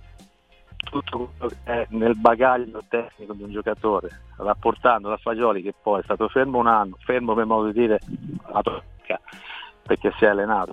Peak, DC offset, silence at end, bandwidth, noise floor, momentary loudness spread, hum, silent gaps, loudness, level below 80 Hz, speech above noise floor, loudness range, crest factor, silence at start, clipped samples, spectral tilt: 0 dBFS; under 0.1%; 0 s; 8.8 kHz; -54 dBFS; 15 LU; none; none; -23 LUFS; -48 dBFS; 32 dB; 2 LU; 24 dB; 0.7 s; under 0.1%; -7.5 dB/octave